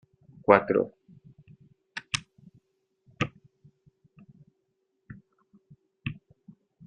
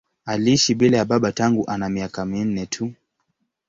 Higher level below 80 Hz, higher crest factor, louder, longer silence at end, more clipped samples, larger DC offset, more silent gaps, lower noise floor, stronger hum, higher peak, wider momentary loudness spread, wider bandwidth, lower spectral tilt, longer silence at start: second, -66 dBFS vs -52 dBFS; first, 30 dB vs 18 dB; second, -28 LUFS vs -20 LUFS; about the same, 0.75 s vs 0.75 s; neither; neither; neither; first, -77 dBFS vs -73 dBFS; neither; about the same, -4 dBFS vs -4 dBFS; first, 29 LU vs 11 LU; about the same, 8 kHz vs 7.8 kHz; about the same, -4 dB/octave vs -5 dB/octave; first, 0.5 s vs 0.25 s